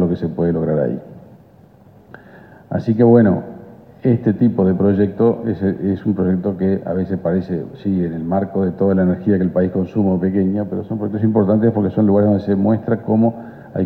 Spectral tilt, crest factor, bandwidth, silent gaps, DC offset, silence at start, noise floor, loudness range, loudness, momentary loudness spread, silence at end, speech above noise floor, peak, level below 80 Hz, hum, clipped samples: -12 dB/octave; 16 dB; 4.4 kHz; none; under 0.1%; 0 s; -46 dBFS; 3 LU; -17 LUFS; 8 LU; 0 s; 30 dB; -2 dBFS; -50 dBFS; none; under 0.1%